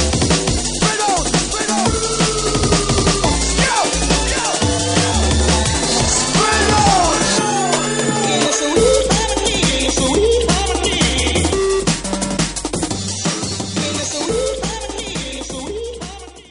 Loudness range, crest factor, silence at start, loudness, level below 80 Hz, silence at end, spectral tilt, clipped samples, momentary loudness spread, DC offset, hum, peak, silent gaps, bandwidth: 6 LU; 16 dB; 0 s; -16 LUFS; -26 dBFS; 0.1 s; -3.5 dB/octave; under 0.1%; 9 LU; under 0.1%; none; 0 dBFS; none; 11 kHz